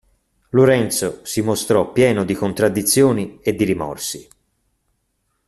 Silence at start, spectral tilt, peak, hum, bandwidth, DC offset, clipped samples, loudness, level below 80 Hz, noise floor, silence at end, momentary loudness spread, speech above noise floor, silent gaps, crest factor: 0.55 s; -5 dB/octave; -2 dBFS; none; 14 kHz; under 0.1%; under 0.1%; -18 LUFS; -52 dBFS; -70 dBFS; 1.25 s; 9 LU; 52 dB; none; 16 dB